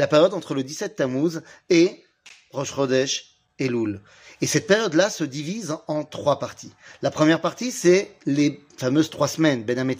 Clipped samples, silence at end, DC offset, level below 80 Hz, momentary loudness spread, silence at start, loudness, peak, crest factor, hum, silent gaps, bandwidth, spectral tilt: under 0.1%; 0 s; under 0.1%; -66 dBFS; 11 LU; 0 s; -23 LUFS; -4 dBFS; 20 dB; none; none; 15.5 kHz; -4.5 dB/octave